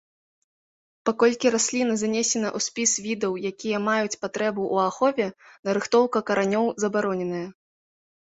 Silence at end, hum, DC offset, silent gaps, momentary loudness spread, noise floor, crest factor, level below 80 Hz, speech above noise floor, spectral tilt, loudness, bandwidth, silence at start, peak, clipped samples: 0.75 s; none; under 0.1%; 5.59-5.63 s; 8 LU; under -90 dBFS; 18 dB; -68 dBFS; over 66 dB; -3.5 dB/octave; -24 LUFS; 8.2 kHz; 1.05 s; -6 dBFS; under 0.1%